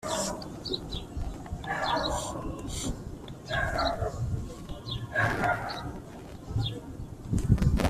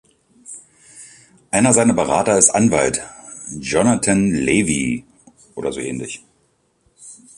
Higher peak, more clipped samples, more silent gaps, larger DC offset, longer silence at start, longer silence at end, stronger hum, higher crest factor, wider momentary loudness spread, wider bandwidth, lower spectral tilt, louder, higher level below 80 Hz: second, -8 dBFS vs 0 dBFS; neither; neither; neither; second, 0 s vs 0.5 s; second, 0 s vs 0.2 s; neither; about the same, 22 dB vs 20 dB; second, 14 LU vs 22 LU; first, 14.5 kHz vs 11.5 kHz; about the same, -5 dB/octave vs -4 dB/octave; second, -32 LUFS vs -17 LUFS; first, -38 dBFS vs -48 dBFS